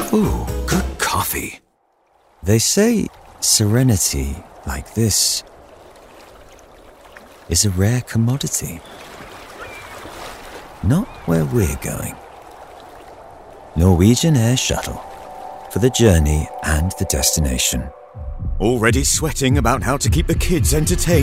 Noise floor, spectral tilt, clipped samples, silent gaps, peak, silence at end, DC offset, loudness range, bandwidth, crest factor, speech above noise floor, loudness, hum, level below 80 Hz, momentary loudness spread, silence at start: -61 dBFS; -4.5 dB/octave; under 0.1%; none; 0 dBFS; 0 s; under 0.1%; 6 LU; 16 kHz; 18 dB; 44 dB; -17 LUFS; none; -28 dBFS; 20 LU; 0 s